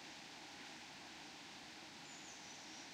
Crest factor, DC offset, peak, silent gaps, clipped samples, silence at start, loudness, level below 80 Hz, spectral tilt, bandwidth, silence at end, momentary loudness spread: 14 dB; under 0.1%; -42 dBFS; none; under 0.1%; 0 s; -53 LUFS; -84 dBFS; -1.5 dB/octave; 16 kHz; 0 s; 1 LU